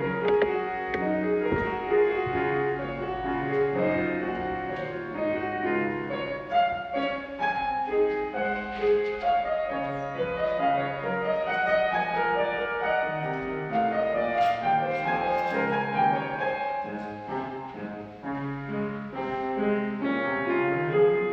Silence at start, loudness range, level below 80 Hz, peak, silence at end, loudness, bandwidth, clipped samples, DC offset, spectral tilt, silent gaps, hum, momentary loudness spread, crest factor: 0 s; 4 LU; -54 dBFS; -12 dBFS; 0 s; -27 LUFS; 6.4 kHz; under 0.1%; under 0.1%; -7.5 dB/octave; none; none; 8 LU; 16 dB